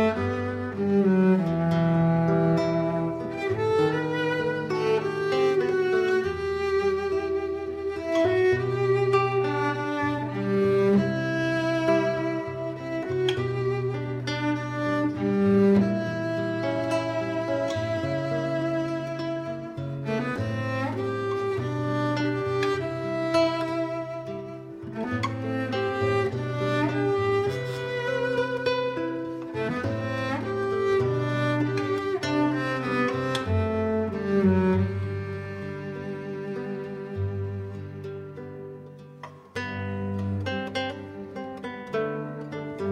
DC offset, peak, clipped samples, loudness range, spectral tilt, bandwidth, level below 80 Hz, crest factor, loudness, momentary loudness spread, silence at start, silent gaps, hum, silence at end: under 0.1%; -10 dBFS; under 0.1%; 9 LU; -7 dB/octave; 11 kHz; -56 dBFS; 16 dB; -26 LUFS; 12 LU; 0 s; none; none; 0 s